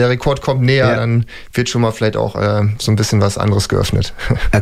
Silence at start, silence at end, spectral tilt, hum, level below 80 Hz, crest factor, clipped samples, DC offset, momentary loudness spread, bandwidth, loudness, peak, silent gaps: 0 s; 0 s; -5.5 dB/octave; none; -28 dBFS; 14 dB; under 0.1%; under 0.1%; 6 LU; 14.5 kHz; -16 LUFS; -2 dBFS; none